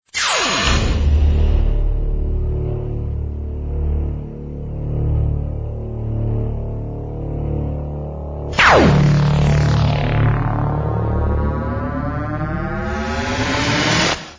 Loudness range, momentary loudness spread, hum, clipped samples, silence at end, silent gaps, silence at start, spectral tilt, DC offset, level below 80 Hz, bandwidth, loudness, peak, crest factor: 8 LU; 12 LU; none; under 0.1%; 0 s; none; 0.15 s; -5.5 dB/octave; under 0.1%; -22 dBFS; 8 kHz; -19 LUFS; 0 dBFS; 18 dB